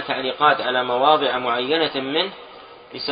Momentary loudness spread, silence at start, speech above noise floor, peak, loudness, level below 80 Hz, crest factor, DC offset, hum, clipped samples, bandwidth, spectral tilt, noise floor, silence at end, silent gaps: 11 LU; 0 s; 20 dB; -2 dBFS; -20 LUFS; -64 dBFS; 20 dB; under 0.1%; none; under 0.1%; 5.2 kHz; -8.5 dB/octave; -40 dBFS; 0 s; none